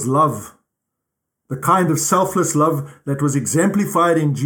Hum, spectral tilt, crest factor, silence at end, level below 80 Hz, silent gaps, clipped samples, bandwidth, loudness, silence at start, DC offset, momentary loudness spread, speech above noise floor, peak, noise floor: none; -5.5 dB/octave; 16 dB; 0 s; -60 dBFS; none; under 0.1%; 20 kHz; -17 LUFS; 0 s; under 0.1%; 9 LU; 62 dB; -2 dBFS; -79 dBFS